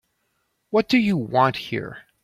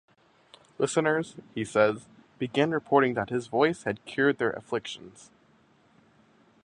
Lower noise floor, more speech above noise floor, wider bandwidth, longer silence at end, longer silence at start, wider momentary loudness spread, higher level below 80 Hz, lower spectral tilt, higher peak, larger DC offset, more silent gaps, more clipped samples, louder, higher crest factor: first, -72 dBFS vs -62 dBFS; first, 51 dB vs 35 dB; first, 14.5 kHz vs 10.5 kHz; second, 0.25 s vs 1.55 s; about the same, 0.7 s vs 0.8 s; about the same, 11 LU vs 13 LU; first, -60 dBFS vs -66 dBFS; first, -6.5 dB/octave vs -5 dB/octave; first, -4 dBFS vs -8 dBFS; neither; neither; neither; first, -21 LUFS vs -27 LUFS; about the same, 20 dB vs 22 dB